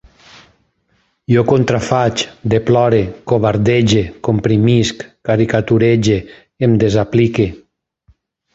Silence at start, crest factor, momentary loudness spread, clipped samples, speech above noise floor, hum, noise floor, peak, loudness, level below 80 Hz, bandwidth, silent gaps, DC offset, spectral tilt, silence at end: 1.3 s; 14 dB; 6 LU; under 0.1%; 48 dB; none; -61 dBFS; -2 dBFS; -14 LUFS; -40 dBFS; 8 kHz; none; under 0.1%; -6.5 dB/octave; 1 s